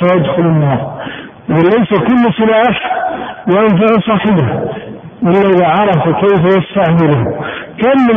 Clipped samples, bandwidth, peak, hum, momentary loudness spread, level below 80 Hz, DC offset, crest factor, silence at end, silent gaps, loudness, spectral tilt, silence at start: under 0.1%; 3.7 kHz; 0 dBFS; none; 12 LU; -42 dBFS; under 0.1%; 10 dB; 0 s; none; -11 LUFS; -10 dB/octave; 0 s